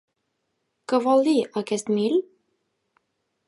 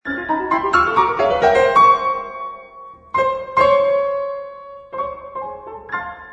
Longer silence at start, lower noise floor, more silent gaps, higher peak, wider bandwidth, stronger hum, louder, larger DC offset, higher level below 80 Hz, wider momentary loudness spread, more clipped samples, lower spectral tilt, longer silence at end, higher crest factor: first, 0.9 s vs 0.05 s; first, -76 dBFS vs -40 dBFS; neither; second, -8 dBFS vs -2 dBFS; first, 11.5 kHz vs 9.2 kHz; neither; second, -23 LUFS vs -17 LUFS; neither; second, -78 dBFS vs -48 dBFS; second, 8 LU vs 18 LU; neither; about the same, -5 dB/octave vs -5 dB/octave; first, 1.25 s vs 0 s; about the same, 16 dB vs 18 dB